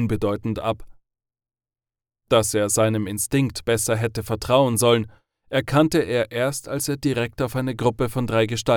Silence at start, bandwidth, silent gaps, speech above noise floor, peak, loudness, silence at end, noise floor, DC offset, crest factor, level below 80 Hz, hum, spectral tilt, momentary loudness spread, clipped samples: 0 s; 19 kHz; none; over 69 dB; -4 dBFS; -22 LUFS; 0 s; under -90 dBFS; under 0.1%; 18 dB; -46 dBFS; none; -5 dB/octave; 7 LU; under 0.1%